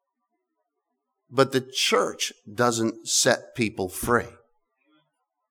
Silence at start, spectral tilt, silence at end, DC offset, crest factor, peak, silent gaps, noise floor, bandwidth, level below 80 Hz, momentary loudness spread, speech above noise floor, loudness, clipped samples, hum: 1.3 s; -3 dB/octave; 1.2 s; under 0.1%; 22 dB; -4 dBFS; none; -81 dBFS; over 20 kHz; -56 dBFS; 9 LU; 56 dB; -24 LUFS; under 0.1%; none